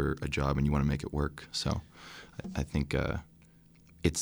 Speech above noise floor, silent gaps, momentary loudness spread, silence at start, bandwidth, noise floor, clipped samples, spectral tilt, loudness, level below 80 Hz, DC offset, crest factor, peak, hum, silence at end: 27 dB; none; 14 LU; 0 s; over 20 kHz; -59 dBFS; under 0.1%; -5.5 dB/octave; -33 LUFS; -42 dBFS; under 0.1%; 20 dB; -12 dBFS; none; 0 s